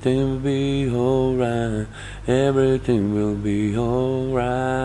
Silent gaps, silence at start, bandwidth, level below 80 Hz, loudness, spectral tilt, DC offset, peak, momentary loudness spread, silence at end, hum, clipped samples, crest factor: none; 0 s; 11 kHz; -38 dBFS; -21 LUFS; -7.5 dB/octave; under 0.1%; -6 dBFS; 4 LU; 0 s; 50 Hz at -40 dBFS; under 0.1%; 14 dB